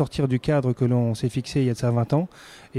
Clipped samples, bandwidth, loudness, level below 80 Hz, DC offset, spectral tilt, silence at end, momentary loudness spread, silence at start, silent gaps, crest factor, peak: under 0.1%; 12 kHz; -23 LUFS; -50 dBFS; under 0.1%; -7.5 dB/octave; 0 s; 3 LU; 0 s; none; 14 dB; -10 dBFS